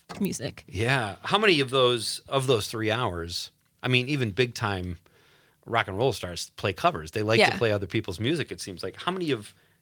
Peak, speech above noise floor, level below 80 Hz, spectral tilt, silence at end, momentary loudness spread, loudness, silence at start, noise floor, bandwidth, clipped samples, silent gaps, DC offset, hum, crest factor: -6 dBFS; 34 dB; -60 dBFS; -4.5 dB/octave; 0.3 s; 13 LU; -26 LUFS; 0.1 s; -61 dBFS; 19.5 kHz; under 0.1%; none; under 0.1%; none; 22 dB